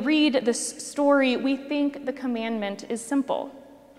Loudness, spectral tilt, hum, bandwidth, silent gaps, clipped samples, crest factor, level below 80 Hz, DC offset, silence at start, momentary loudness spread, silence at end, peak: -25 LUFS; -3 dB/octave; none; 13 kHz; none; under 0.1%; 18 dB; -70 dBFS; under 0.1%; 0 s; 10 LU; 0.2 s; -8 dBFS